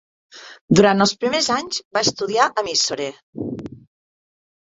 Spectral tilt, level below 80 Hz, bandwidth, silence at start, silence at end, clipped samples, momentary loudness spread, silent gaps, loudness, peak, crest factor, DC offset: -3.5 dB/octave; -56 dBFS; 8.2 kHz; 0.35 s; 0.95 s; under 0.1%; 18 LU; 0.61-0.68 s, 1.85-1.91 s, 3.23-3.33 s; -19 LUFS; -2 dBFS; 20 dB; under 0.1%